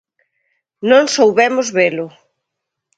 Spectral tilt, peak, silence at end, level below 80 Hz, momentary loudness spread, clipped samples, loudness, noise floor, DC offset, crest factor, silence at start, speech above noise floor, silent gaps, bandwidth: -3.5 dB/octave; 0 dBFS; 0.9 s; -68 dBFS; 13 LU; under 0.1%; -13 LUFS; -78 dBFS; under 0.1%; 16 dB; 0.8 s; 65 dB; none; 9.2 kHz